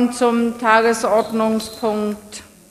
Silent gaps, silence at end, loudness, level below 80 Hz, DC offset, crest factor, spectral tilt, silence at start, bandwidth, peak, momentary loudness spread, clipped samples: none; 0.25 s; -18 LUFS; -56 dBFS; under 0.1%; 18 dB; -4 dB/octave; 0 s; 15 kHz; 0 dBFS; 15 LU; under 0.1%